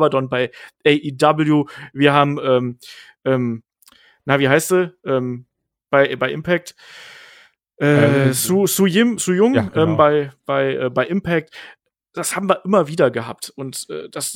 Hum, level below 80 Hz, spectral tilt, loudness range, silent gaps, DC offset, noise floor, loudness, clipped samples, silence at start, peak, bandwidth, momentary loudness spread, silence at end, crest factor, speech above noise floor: none; -58 dBFS; -5 dB/octave; 5 LU; none; under 0.1%; -52 dBFS; -18 LUFS; under 0.1%; 0 s; 0 dBFS; 19.5 kHz; 14 LU; 0 s; 18 dB; 35 dB